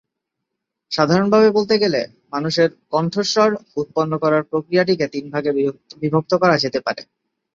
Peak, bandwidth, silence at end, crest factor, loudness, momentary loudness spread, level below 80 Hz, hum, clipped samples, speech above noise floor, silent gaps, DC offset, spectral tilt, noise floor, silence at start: 0 dBFS; 7.6 kHz; 0.55 s; 18 dB; -18 LUFS; 10 LU; -60 dBFS; none; under 0.1%; 62 dB; none; under 0.1%; -5.5 dB/octave; -80 dBFS; 0.9 s